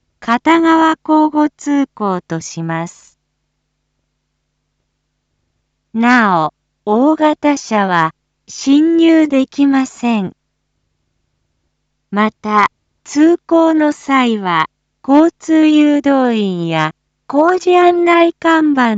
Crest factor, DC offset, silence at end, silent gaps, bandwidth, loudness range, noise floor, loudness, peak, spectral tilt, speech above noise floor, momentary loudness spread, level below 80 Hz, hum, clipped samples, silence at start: 14 dB; under 0.1%; 0 s; none; 8 kHz; 8 LU; -69 dBFS; -13 LUFS; 0 dBFS; -5.5 dB/octave; 57 dB; 11 LU; -60 dBFS; none; under 0.1%; 0.2 s